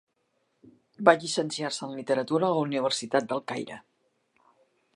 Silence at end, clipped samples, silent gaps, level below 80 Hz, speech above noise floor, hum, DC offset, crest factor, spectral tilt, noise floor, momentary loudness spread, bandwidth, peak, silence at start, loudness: 1.15 s; under 0.1%; none; -78 dBFS; 48 dB; none; under 0.1%; 26 dB; -4 dB/octave; -74 dBFS; 13 LU; 11.5 kHz; -2 dBFS; 1 s; -27 LUFS